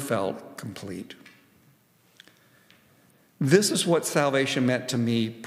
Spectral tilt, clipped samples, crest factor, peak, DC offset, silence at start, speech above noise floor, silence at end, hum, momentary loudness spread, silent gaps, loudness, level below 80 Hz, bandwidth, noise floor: -4.5 dB/octave; under 0.1%; 24 dB; -4 dBFS; under 0.1%; 0 s; 37 dB; 0 s; none; 18 LU; none; -24 LUFS; -76 dBFS; 16 kHz; -62 dBFS